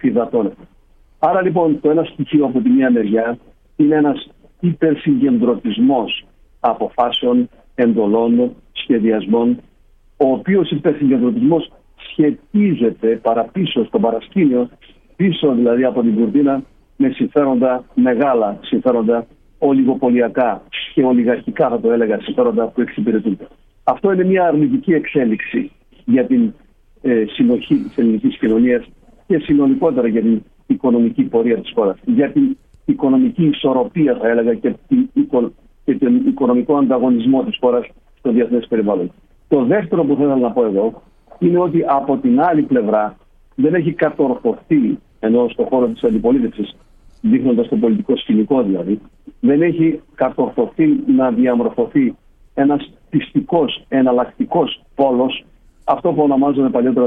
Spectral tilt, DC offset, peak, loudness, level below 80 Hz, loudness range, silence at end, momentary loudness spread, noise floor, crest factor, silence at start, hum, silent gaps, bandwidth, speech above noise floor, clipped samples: -10 dB/octave; under 0.1%; -2 dBFS; -16 LUFS; -48 dBFS; 1 LU; 0 s; 7 LU; -50 dBFS; 14 dB; 0.05 s; none; none; 3.8 kHz; 35 dB; under 0.1%